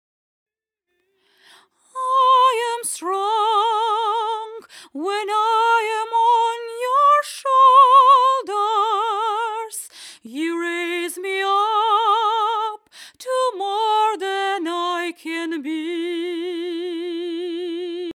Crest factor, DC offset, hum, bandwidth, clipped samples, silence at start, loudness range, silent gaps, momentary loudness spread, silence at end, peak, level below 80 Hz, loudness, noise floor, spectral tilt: 18 dB; under 0.1%; none; 16 kHz; under 0.1%; 1.95 s; 8 LU; none; 13 LU; 0 s; -2 dBFS; under -90 dBFS; -19 LUFS; -77 dBFS; -0.5 dB/octave